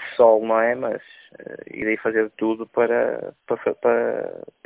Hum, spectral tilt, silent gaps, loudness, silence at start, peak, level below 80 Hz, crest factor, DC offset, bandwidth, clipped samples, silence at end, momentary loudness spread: none; -9.5 dB/octave; none; -21 LUFS; 0 s; -2 dBFS; -64 dBFS; 20 dB; under 0.1%; 4 kHz; under 0.1%; 0.35 s; 17 LU